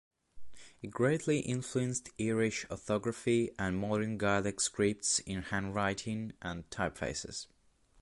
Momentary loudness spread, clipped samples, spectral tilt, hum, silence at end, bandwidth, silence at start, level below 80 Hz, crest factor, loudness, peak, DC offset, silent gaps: 10 LU; under 0.1%; -4.5 dB/octave; none; 0.55 s; 11.5 kHz; 0.35 s; -58 dBFS; 18 dB; -34 LUFS; -16 dBFS; under 0.1%; none